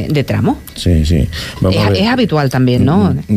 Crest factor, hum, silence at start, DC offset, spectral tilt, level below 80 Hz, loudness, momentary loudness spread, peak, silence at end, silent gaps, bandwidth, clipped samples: 10 dB; none; 0 s; under 0.1%; -7 dB/octave; -26 dBFS; -13 LUFS; 6 LU; -2 dBFS; 0 s; none; 15.5 kHz; under 0.1%